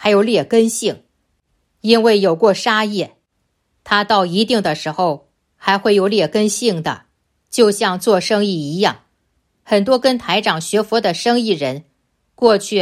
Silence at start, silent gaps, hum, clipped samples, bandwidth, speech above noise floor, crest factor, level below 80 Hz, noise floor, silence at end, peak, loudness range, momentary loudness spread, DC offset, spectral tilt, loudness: 0 s; none; none; under 0.1%; 15 kHz; 53 dB; 16 dB; -60 dBFS; -68 dBFS; 0 s; 0 dBFS; 2 LU; 10 LU; under 0.1%; -4 dB/octave; -16 LUFS